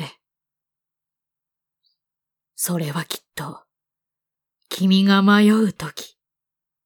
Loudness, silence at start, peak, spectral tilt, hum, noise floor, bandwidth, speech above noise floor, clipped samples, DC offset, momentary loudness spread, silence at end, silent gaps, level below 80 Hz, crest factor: -18 LUFS; 0 s; -4 dBFS; -5 dB/octave; none; -87 dBFS; 19.5 kHz; 69 dB; under 0.1%; under 0.1%; 21 LU; 0.8 s; none; -66 dBFS; 18 dB